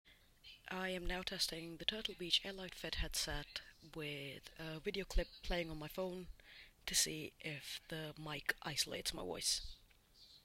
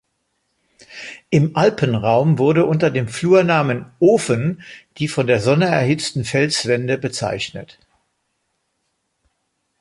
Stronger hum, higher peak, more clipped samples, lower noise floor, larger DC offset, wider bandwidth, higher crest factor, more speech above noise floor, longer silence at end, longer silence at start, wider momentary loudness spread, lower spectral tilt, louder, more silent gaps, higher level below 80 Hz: neither; second, -20 dBFS vs -2 dBFS; neither; second, -66 dBFS vs -71 dBFS; neither; first, 16 kHz vs 11.5 kHz; first, 24 dB vs 16 dB; second, 24 dB vs 54 dB; second, 0.05 s vs 2.15 s; second, 0.05 s vs 0.9 s; about the same, 15 LU vs 13 LU; second, -2 dB/octave vs -6 dB/octave; second, -42 LUFS vs -17 LUFS; neither; about the same, -52 dBFS vs -54 dBFS